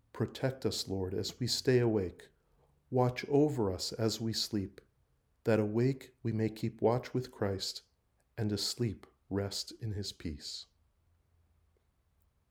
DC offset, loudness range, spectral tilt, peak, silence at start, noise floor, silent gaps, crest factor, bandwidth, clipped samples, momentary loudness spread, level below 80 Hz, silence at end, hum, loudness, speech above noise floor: under 0.1%; 7 LU; -5.5 dB/octave; -16 dBFS; 0.15 s; -74 dBFS; none; 20 dB; over 20 kHz; under 0.1%; 11 LU; -64 dBFS; 1.85 s; none; -34 LUFS; 40 dB